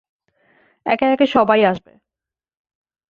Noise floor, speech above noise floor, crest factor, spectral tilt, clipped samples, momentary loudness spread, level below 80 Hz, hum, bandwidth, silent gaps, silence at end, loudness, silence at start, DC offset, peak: -89 dBFS; 73 dB; 18 dB; -7 dB/octave; under 0.1%; 14 LU; -60 dBFS; none; 7 kHz; none; 1.3 s; -16 LUFS; 0.85 s; under 0.1%; -2 dBFS